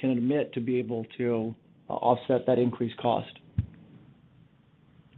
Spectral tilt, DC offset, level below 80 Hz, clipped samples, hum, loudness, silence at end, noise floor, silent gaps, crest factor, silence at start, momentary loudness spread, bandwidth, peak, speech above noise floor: -10.5 dB/octave; under 0.1%; -56 dBFS; under 0.1%; none; -29 LUFS; 1.2 s; -60 dBFS; none; 20 dB; 0 s; 11 LU; 4.2 kHz; -10 dBFS; 33 dB